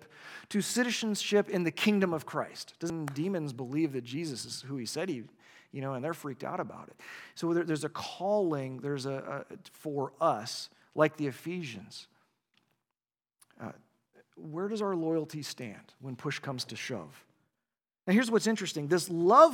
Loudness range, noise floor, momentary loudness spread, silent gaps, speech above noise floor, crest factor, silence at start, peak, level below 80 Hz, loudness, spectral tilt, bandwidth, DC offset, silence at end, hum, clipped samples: 7 LU; under -90 dBFS; 18 LU; none; over 59 dB; 24 dB; 0 s; -8 dBFS; -82 dBFS; -32 LUFS; -5 dB/octave; 18.5 kHz; under 0.1%; 0 s; none; under 0.1%